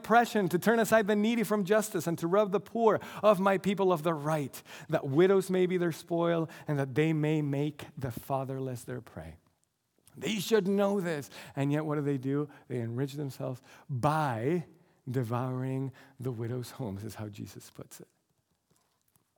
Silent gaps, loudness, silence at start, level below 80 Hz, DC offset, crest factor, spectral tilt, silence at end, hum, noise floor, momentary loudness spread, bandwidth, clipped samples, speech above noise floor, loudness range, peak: none; -30 LUFS; 0 s; -72 dBFS; under 0.1%; 20 dB; -6.5 dB/octave; 1.35 s; none; -76 dBFS; 16 LU; 19.5 kHz; under 0.1%; 46 dB; 9 LU; -10 dBFS